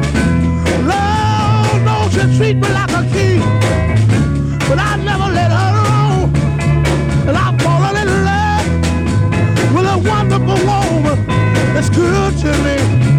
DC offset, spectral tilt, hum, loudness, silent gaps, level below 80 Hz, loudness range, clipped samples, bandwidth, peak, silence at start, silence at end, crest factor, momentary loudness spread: under 0.1%; -6.5 dB/octave; none; -13 LUFS; none; -26 dBFS; 1 LU; under 0.1%; 12.5 kHz; -2 dBFS; 0 s; 0 s; 10 dB; 2 LU